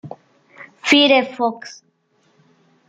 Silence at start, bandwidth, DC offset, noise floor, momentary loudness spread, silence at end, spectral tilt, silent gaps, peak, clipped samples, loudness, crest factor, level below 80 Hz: 0.05 s; 9.4 kHz; under 0.1%; -62 dBFS; 25 LU; 1.15 s; -3 dB/octave; none; -2 dBFS; under 0.1%; -15 LUFS; 20 dB; -70 dBFS